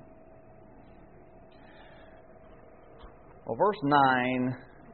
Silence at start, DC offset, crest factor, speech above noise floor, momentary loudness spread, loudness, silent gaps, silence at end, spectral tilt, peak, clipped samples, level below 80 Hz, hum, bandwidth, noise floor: 3.05 s; 0.1%; 22 dB; 28 dB; 19 LU; -27 LUFS; none; 0.3 s; -4 dB/octave; -10 dBFS; under 0.1%; -60 dBFS; none; 4.5 kHz; -54 dBFS